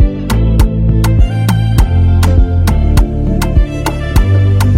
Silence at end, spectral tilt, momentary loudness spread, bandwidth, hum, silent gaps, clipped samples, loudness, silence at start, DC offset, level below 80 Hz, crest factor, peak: 0 s; -7 dB/octave; 4 LU; 16.5 kHz; none; none; under 0.1%; -12 LUFS; 0 s; under 0.1%; -12 dBFS; 8 dB; 0 dBFS